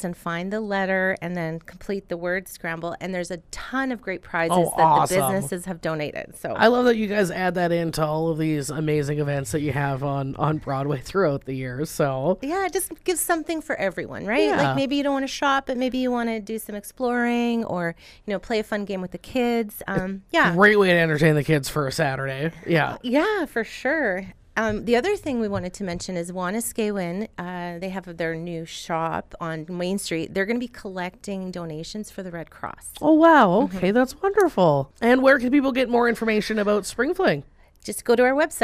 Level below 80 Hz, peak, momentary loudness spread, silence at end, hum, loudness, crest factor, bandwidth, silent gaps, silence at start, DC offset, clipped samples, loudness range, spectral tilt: -50 dBFS; -4 dBFS; 14 LU; 0 s; none; -23 LUFS; 18 dB; 15.5 kHz; none; 0 s; under 0.1%; under 0.1%; 8 LU; -5.5 dB/octave